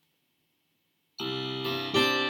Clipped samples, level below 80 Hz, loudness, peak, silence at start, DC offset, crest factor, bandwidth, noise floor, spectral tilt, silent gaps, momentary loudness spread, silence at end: under 0.1%; -70 dBFS; -29 LUFS; -10 dBFS; 1.2 s; under 0.1%; 20 dB; 18 kHz; -75 dBFS; -4 dB/octave; none; 12 LU; 0 s